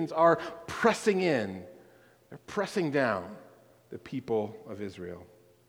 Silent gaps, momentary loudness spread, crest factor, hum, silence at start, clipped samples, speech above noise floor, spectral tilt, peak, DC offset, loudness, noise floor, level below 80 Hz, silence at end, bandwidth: none; 22 LU; 22 dB; none; 0 s; under 0.1%; 29 dB; -5.5 dB/octave; -8 dBFS; under 0.1%; -30 LUFS; -59 dBFS; -68 dBFS; 0.4 s; 20 kHz